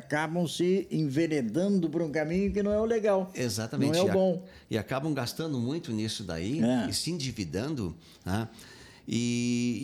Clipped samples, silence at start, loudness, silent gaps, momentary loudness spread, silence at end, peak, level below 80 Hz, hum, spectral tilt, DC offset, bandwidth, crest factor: under 0.1%; 0 s; -29 LUFS; none; 8 LU; 0 s; -14 dBFS; -54 dBFS; none; -5.5 dB/octave; under 0.1%; 19 kHz; 14 dB